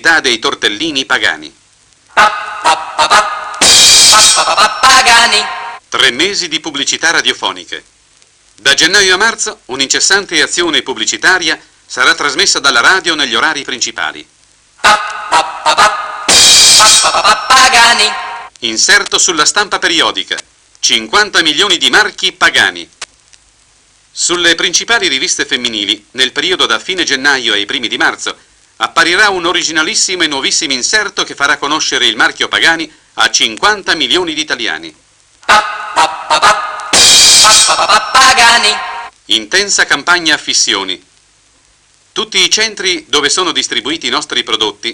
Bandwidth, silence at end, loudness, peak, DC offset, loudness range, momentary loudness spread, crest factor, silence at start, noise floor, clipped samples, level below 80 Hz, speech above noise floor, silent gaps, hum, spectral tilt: over 20 kHz; 0 s; -8 LUFS; 0 dBFS; under 0.1%; 7 LU; 13 LU; 12 dB; 0.05 s; -49 dBFS; 0.6%; -46 dBFS; 38 dB; none; none; 0.5 dB/octave